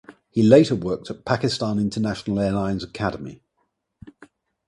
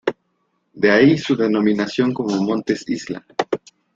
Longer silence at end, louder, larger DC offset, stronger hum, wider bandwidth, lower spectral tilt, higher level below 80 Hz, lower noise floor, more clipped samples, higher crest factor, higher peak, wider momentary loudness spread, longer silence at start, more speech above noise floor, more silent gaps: first, 0.55 s vs 0.4 s; second, -22 LUFS vs -19 LUFS; neither; neither; first, 11.5 kHz vs 7.8 kHz; about the same, -6.5 dB/octave vs -6 dB/octave; first, -50 dBFS vs -58 dBFS; first, -73 dBFS vs -68 dBFS; neither; about the same, 22 dB vs 18 dB; about the same, 0 dBFS vs -2 dBFS; about the same, 13 LU vs 13 LU; about the same, 0.1 s vs 0.05 s; about the same, 52 dB vs 51 dB; neither